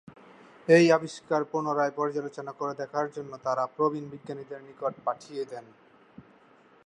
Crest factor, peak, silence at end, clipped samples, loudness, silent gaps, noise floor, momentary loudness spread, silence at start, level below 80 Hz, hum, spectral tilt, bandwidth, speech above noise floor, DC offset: 22 dB; -6 dBFS; 1.25 s; under 0.1%; -28 LUFS; none; -58 dBFS; 18 LU; 0.05 s; -78 dBFS; none; -6 dB/octave; 10 kHz; 30 dB; under 0.1%